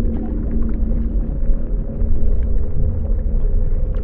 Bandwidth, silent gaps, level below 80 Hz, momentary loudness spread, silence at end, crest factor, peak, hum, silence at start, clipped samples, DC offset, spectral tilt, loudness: 2 kHz; none; -18 dBFS; 2 LU; 0 s; 12 dB; -4 dBFS; none; 0 s; under 0.1%; under 0.1%; -13 dB/octave; -23 LUFS